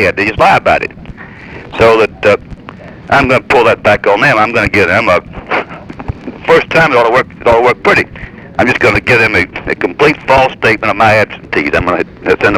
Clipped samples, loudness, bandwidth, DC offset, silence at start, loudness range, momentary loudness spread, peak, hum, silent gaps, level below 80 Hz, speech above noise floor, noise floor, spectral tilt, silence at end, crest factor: under 0.1%; -9 LUFS; 19 kHz; under 0.1%; 0 s; 2 LU; 17 LU; 0 dBFS; none; none; -34 dBFS; 21 dB; -30 dBFS; -5.5 dB/octave; 0 s; 10 dB